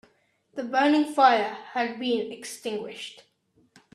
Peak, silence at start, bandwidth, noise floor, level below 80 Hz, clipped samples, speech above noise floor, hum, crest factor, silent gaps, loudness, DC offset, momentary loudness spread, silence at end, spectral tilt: -6 dBFS; 0.55 s; 13 kHz; -66 dBFS; -78 dBFS; under 0.1%; 41 dB; none; 20 dB; none; -25 LUFS; under 0.1%; 18 LU; 0.8 s; -3.5 dB/octave